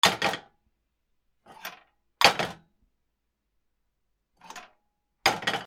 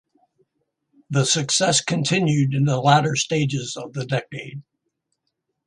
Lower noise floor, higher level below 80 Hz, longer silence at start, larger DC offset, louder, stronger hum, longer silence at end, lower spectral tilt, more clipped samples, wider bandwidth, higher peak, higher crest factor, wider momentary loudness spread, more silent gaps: about the same, -79 dBFS vs -77 dBFS; about the same, -64 dBFS vs -62 dBFS; second, 0.05 s vs 1.1 s; neither; second, -24 LUFS vs -20 LUFS; neither; second, 0 s vs 1.05 s; second, -1.5 dB/octave vs -4 dB/octave; neither; first, 16 kHz vs 11 kHz; about the same, -2 dBFS vs 0 dBFS; first, 30 dB vs 22 dB; first, 24 LU vs 14 LU; neither